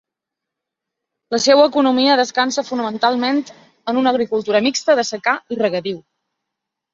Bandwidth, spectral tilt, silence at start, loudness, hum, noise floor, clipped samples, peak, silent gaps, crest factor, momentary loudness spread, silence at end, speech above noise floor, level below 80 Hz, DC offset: 7.8 kHz; -3 dB/octave; 1.3 s; -17 LUFS; none; -83 dBFS; under 0.1%; -2 dBFS; none; 18 dB; 11 LU; 0.95 s; 67 dB; -64 dBFS; under 0.1%